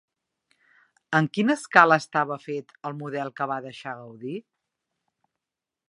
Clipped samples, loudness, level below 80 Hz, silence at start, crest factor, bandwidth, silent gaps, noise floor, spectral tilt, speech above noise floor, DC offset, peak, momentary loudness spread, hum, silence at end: under 0.1%; -23 LUFS; -78 dBFS; 1.1 s; 26 dB; 11.5 kHz; none; -88 dBFS; -5.5 dB/octave; 64 dB; under 0.1%; 0 dBFS; 19 LU; none; 1.5 s